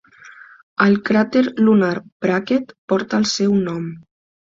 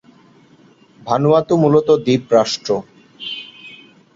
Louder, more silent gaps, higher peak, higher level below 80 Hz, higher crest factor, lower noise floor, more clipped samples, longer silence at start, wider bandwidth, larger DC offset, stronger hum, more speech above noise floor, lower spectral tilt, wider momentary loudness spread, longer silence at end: about the same, -18 LUFS vs -16 LUFS; first, 0.63-0.76 s, 2.12-2.20 s, 2.78-2.88 s vs none; about the same, -2 dBFS vs -2 dBFS; about the same, -60 dBFS vs -56 dBFS; about the same, 18 dB vs 16 dB; second, -43 dBFS vs -49 dBFS; neither; second, 0.25 s vs 1.05 s; about the same, 7.6 kHz vs 7.8 kHz; neither; neither; second, 26 dB vs 35 dB; about the same, -5.5 dB/octave vs -6 dB/octave; second, 9 LU vs 22 LU; first, 0.6 s vs 0.4 s